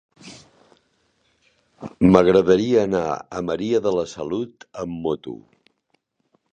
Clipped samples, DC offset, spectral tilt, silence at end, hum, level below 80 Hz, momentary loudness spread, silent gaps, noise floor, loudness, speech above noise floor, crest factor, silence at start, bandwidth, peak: under 0.1%; under 0.1%; -7 dB/octave; 1.15 s; none; -50 dBFS; 25 LU; none; -69 dBFS; -20 LUFS; 50 dB; 22 dB; 0.25 s; 9 kHz; 0 dBFS